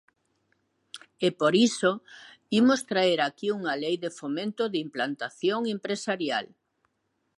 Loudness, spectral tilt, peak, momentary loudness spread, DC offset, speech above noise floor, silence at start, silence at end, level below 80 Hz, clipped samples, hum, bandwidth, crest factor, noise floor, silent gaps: -27 LUFS; -4.5 dB/octave; -10 dBFS; 10 LU; under 0.1%; 50 dB; 0.95 s; 0.95 s; -78 dBFS; under 0.1%; none; 11.5 kHz; 18 dB; -76 dBFS; none